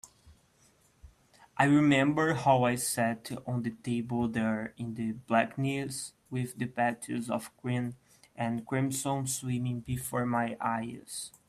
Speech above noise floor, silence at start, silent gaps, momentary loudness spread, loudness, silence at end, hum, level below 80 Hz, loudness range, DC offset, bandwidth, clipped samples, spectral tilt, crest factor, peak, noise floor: 35 dB; 0.05 s; none; 11 LU; -31 LUFS; 0.2 s; none; -64 dBFS; 6 LU; under 0.1%; 15 kHz; under 0.1%; -5.5 dB/octave; 22 dB; -10 dBFS; -66 dBFS